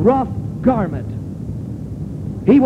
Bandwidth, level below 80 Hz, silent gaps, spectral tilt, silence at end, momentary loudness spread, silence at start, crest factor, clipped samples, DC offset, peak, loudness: 7.4 kHz; -36 dBFS; none; -10 dB/octave; 0 s; 12 LU; 0 s; 16 dB; under 0.1%; under 0.1%; -2 dBFS; -21 LUFS